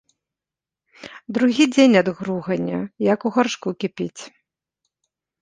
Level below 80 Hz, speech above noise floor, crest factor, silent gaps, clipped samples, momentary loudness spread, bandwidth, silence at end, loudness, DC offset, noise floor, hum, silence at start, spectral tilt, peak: -64 dBFS; 69 dB; 20 dB; none; under 0.1%; 15 LU; 9.6 kHz; 1.15 s; -20 LUFS; under 0.1%; -89 dBFS; none; 1 s; -5.5 dB/octave; -2 dBFS